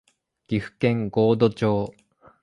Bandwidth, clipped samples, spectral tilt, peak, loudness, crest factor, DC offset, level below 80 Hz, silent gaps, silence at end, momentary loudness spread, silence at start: 10.5 kHz; under 0.1%; -8.5 dB/octave; -6 dBFS; -23 LUFS; 18 dB; under 0.1%; -54 dBFS; none; 0.55 s; 9 LU; 0.5 s